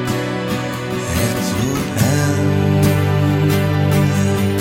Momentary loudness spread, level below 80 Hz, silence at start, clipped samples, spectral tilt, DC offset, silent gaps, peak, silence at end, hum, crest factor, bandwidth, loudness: 6 LU; -38 dBFS; 0 s; under 0.1%; -6 dB/octave; under 0.1%; none; -4 dBFS; 0 s; none; 12 dB; 17 kHz; -17 LUFS